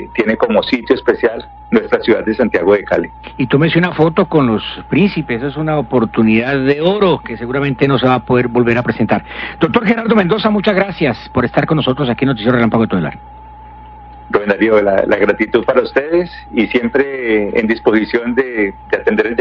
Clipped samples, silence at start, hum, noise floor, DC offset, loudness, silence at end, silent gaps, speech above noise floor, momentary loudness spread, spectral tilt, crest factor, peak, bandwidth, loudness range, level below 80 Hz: under 0.1%; 0 s; none; -34 dBFS; under 0.1%; -14 LUFS; 0 s; none; 21 dB; 6 LU; -8.5 dB/octave; 14 dB; 0 dBFS; 6.4 kHz; 2 LU; -40 dBFS